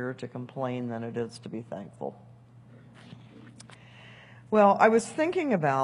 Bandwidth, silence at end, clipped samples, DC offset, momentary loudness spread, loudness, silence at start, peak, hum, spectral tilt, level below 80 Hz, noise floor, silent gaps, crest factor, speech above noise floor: 11.5 kHz; 0 s; under 0.1%; under 0.1%; 27 LU; -27 LUFS; 0 s; -6 dBFS; none; -6 dB/octave; -72 dBFS; -52 dBFS; none; 24 dB; 26 dB